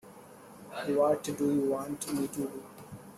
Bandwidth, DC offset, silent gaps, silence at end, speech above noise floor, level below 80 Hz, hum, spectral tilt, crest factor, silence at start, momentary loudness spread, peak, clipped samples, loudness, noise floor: 15.5 kHz; under 0.1%; none; 0 s; 21 dB; -70 dBFS; none; -5.5 dB/octave; 18 dB; 0.05 s; 23 LU; -16 dBFS; under 0.1%; -31 LUFS; -52 dBFS